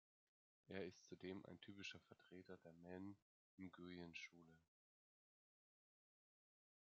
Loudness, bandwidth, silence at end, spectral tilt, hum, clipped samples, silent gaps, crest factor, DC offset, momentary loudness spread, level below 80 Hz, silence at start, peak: -58 LUFS; 7 kHz; 2.2 s; -4 dB/octave; none; under 0.1%; 3.22-3.58 s; 26 dB; under 0.1%; 8 LU; under -90 dBFS; 0.65 s; -34 dBFS